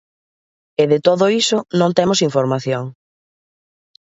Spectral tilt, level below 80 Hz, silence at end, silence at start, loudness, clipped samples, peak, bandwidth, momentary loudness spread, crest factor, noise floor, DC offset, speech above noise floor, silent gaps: -5 dB/octave; -62 dBFS; 1.25 s; 0.8 s; -16 LUFS; under 0.1%; 0 dBFS; 8 kHz; 9 LU; 18 dB; under -90 dBFS; under 0.1%; over 74 dB; none